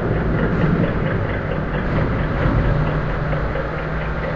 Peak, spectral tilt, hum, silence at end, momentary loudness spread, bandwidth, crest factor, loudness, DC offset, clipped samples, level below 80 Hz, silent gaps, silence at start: -4 dBFS; -9.5 dB/octave; none; 0 s; 5 LU; 6.2 kHz; 14 dB; -21 LUFS; 0.5%; under 0.1%; -26 dBFS; none; 0 s